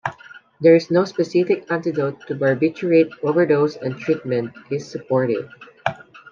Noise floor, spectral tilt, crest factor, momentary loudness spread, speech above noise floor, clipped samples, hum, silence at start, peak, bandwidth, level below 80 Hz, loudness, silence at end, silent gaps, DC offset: -43 dBFS; -7.5 dB/octave; 18 dB; 12 LU; 25 dB; under 0.1%; none; 0.05 s; -2 dBFS; 7.4 kHz; -66 dBFS; -20 LUFS; 0.15 s; none; under 0.1%